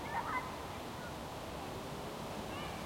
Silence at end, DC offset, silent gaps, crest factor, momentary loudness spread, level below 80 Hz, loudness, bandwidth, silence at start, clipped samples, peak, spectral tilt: 0 s; under 0.1%; none; 16 dB; 6 LU; -58 dBFS; -43 LUFS; 16.5 kHz; 0 s; under 0.1%; -26 dBFS; -4.5 dB/octave